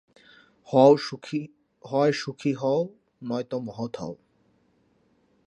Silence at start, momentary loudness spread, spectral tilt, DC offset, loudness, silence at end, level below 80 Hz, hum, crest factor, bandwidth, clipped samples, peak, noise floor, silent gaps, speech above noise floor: 0.7 s; 19 LU; -6.5 dB/octave; under 0.1%; -25 LUFS; 1.3 s; -72 dBFS; none; 22 dB; 10.5 kHz; under 0.1%; -4 dBFS; -66 dBFS; none; 42 dB